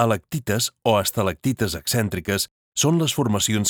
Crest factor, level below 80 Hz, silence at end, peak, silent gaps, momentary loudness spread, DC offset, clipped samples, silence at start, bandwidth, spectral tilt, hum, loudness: 18 dB; -50 dBFS; 0 s; -4 dBFS; 2.51-2.72 s; 5 LU; under 0.1%; under 0.1%; 0 s; over 20 kHz; -4 dB/octave; none; -22 LUFS